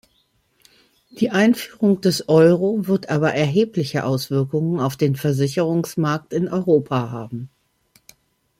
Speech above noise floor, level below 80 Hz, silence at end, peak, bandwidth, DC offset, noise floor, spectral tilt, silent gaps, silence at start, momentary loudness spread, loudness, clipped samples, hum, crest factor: 45 dB; -60 dBFS; 1.15 s; -2 dBFS; 16.5 kHz; under 0.1%; -64 dBFS; -6.5 dB/octave; none; 1.15 s; 9 LU; -19 LUFS; under 0.1%; none; 18 dB